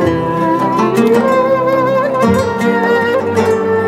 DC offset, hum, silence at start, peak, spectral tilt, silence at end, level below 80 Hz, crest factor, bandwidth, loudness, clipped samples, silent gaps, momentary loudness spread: under 0.1%; none; 0 s; 0 dBFS; -6.5 dB/octave; 0 s; -44 dBFS; 12 dB; 15.5 kHz; -13 LUFS; under 0.1%; none; 3 LU